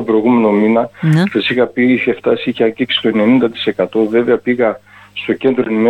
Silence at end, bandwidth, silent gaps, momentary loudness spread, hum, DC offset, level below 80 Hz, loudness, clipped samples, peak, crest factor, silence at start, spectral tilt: 0 s; 9.8 kHz; none; 5 LU; none; under 0.1%; -56 dBFS; -14 LUFS; under 0.1%; -2 dBFS; 12 dB; 0 s; -7.5 dB/octave